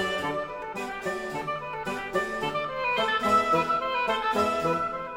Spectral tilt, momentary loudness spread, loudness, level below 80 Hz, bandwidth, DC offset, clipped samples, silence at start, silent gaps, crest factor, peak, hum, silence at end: -4 dB/octave; 10 LU; -27 LUFS; -54 dBFS; 16.5 kHz; under 0.1%; under 0.1%; 0 s; none; 16 dB; -12 dBFS; none; 0 s